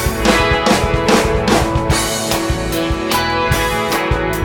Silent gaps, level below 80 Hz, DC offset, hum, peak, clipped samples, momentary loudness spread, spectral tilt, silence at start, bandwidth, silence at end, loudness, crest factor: none; -24 dBFS; under 0.1%; none; 0 dBFS; under 0.1%; 4 LU; -4 dB/octave; 0 s; 19.5 kHz; 0 s; -15 LUFS; 14 dB